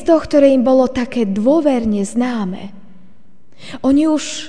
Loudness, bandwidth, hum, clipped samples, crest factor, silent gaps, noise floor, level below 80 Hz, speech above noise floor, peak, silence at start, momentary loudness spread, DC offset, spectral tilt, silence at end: -15 LUFS; 10 kHz; none; under 0.1%; 16 dB; none; -52 dBFS; -44 dBFS; 37 dB; 0 dBFS; 0 s; 13 LU; 2%; -5.5 dB/octave; 0 s